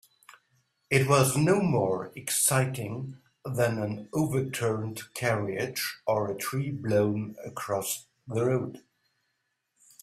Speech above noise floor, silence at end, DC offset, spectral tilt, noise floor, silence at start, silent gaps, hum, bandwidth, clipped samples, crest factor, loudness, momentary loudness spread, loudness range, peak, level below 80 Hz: 51 dB; 1.25 s; under 0.1%; -5 dB/octave; -79 dBFS; 0.9 s; none; none; 16 kHz; under 0.1%; 20 dB; -28 LUFS; 13 LU; 5 LU; -8 dBFS; -64 dBFS